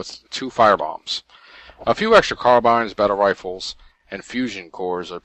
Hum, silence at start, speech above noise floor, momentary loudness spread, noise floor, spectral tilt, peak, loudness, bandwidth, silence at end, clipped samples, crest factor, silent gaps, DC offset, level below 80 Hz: none; 0 s; 26 dB; 15 LU; -46 dBFS; -4 dB/octave; 0 dBFS; -19 LUFS; 9.2 kHz; 0.05 s; under 0.1%; 20 dB; none; under 0.1%; -50 dBFS